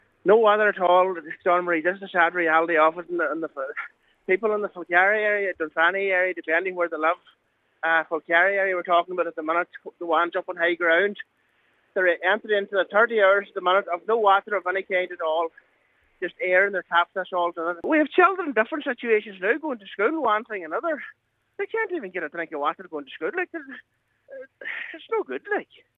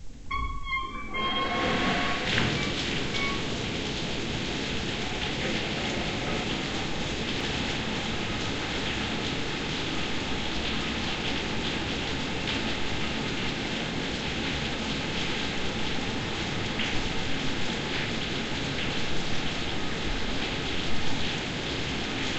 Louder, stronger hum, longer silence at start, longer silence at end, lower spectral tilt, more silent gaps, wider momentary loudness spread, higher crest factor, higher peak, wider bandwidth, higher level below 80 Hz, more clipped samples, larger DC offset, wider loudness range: first, -23 LUFS vs -29 LUFS; neither; first, 0.25 s vs 0 s; first, 0.35 s vs 0 s; first, -6.5 dB/octave vs -4 dB/octave; neither; first, 13 LU vs 4 LU; about the same, 20 dB vs 18 dB; first, -4 dBFS vs -10 dBFS; second, 6.8 kHz vs 8.4 kHz; second, -78 dBFS vs -42 dBFS; neither; neither; first, 8 LU vs 2 LU